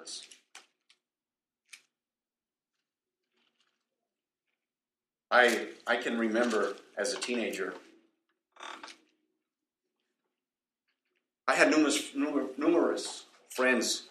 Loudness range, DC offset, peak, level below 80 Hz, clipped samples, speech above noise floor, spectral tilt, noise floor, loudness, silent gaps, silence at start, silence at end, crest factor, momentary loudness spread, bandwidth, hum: 12 LU; under 0.1%; -8 dBFS; -82 dBFS; under 0.1%; over 61 dB; -2 dB/octave; under -90 dBFS; -29 LUFS; none; 0 s; 0.05 s; 26 dB; 21 LU; 14.5 kHz; none